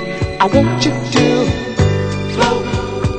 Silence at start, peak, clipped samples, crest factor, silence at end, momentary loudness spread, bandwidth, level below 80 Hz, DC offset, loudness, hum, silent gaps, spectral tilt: 0 s; 0 dBFS; under 0.1%; 14 dB; 0 s; 6 LU; 9 kHz; -30 dBFS; under 0.1%; -15 LUFS; none; none; -6 dB/octave